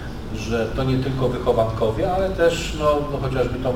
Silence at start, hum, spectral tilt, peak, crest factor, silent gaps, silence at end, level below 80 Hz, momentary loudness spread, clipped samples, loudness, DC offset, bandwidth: 0 s; none; -6.5 dB/octave; -6 dBFS; 16 dB; none; 0 s; -32 dBFS; 5 LU; under 0.1%; -22 LUFS; under 0.1%; 17 kHz